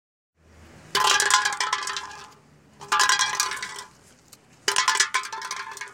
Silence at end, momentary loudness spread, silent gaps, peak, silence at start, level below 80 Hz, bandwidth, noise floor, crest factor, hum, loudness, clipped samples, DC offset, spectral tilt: 0 s; 14 LU; none; -4 dBFS; 0.6 s; -64 dBFS; 17 kHz; -54 dBFS; 22 dB; none; -23 LUFS; under 0.1%; under 0.1%; 1.5 dB/octave